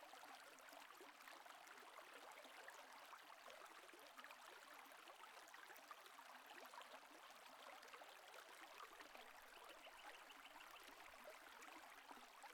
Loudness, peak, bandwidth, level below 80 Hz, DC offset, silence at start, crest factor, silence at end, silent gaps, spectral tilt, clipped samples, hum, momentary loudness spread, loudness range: -61 LUFS; -44 dBFS; 19 kHz; under -90 dBFS; under 0.1%; 0 s; 18 dB; 0 s; none; 0 dB/octave; under 0.1%; none; 2 LU; 0 LU